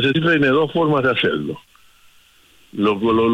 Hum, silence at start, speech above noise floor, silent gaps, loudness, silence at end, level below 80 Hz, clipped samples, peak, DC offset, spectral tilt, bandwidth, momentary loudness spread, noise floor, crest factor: none; 0 s; 35 dB; none; -17 LUFS; 0 s; -54 dBFS; under 0.1%; -6 dBFS; under 0.1%; -7 dB/octave; 11.5 kHz; 14 LU; -52 dBFS; 12 dB